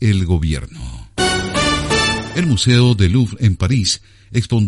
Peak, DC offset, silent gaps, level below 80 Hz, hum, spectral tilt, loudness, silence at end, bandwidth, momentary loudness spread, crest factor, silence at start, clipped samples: 0 dBFS; under 0.1%; none; -30 dBFS; none; -5 dB/octave; -16 LUFS; 0 s; 11.5 kHz; 10 LU; 16 dB; 0 s; under 0.1%